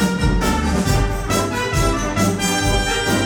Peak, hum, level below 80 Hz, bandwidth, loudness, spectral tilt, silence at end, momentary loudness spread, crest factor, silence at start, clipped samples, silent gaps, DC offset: -4 dBFS; none; -24 dBFS; over 20 kHz; -18 LUFS; -4.5 dB/octave; 0 s; 2 LU; 14 dB; 0 s; under 0.1%; none; under 0.1%